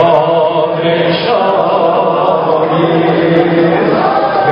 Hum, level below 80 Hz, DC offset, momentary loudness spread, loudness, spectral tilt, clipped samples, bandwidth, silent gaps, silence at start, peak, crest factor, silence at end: none; -50 dBFS; under 0.1%; 2 LU; -11 LUFS; -9 dB/octave; 0.2%; 5.4 kHz; none; 0 s; 0 dBFS; 10 dB; 0 s